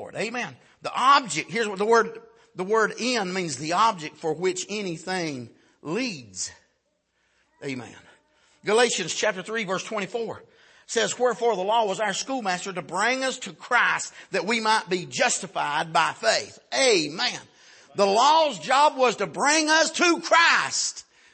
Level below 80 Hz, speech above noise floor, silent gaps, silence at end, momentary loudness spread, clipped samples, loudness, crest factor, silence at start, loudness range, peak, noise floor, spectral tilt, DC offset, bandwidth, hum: -76 dBFS; 48 dB; none; 0.3 s; 14 LU; under 0.1%; -23 LUFS; 20 dB; 0 s; 10 LU; -6 dBFS; -72 dBFS; -2 dB/octave; under 0.1%; 8.8 kHz; none